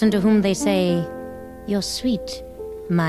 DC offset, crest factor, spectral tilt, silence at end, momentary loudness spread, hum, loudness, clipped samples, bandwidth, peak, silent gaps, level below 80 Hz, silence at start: under 0.1%; 14 dB; -5.5 dB/octave; 0 s; 17 LU; none; -21 LUFS; under 0.1%; 14.5 kHz; -8 dBFS; none; -46 dBFS; 0 s